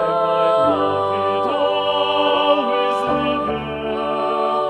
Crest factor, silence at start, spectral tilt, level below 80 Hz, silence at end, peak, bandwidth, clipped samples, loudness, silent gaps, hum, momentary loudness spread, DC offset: 16 dB; 0 s; -5.5 dB/octave; -50 dBFS; 0 s; -2 dBFS; 11 kHz; under 0.1%; -18 LUFS; none; none; 6 LU; under 0.1%